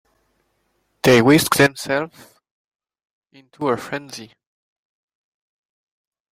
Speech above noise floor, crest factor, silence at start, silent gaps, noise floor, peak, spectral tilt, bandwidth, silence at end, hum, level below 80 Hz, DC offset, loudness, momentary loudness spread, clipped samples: 50 dB; 20 dB; 1.05 s; 2.51-2.69 s, 2.75-2.79 s, 3.05-3.22 s; -68 dBFS; -2 dBFS; -4.5 dB/octave; 16.5 kHz; 2.05 s; none; -56 dBFS; under 0.1%; -17 LUFS; 19 LU; under 0.1%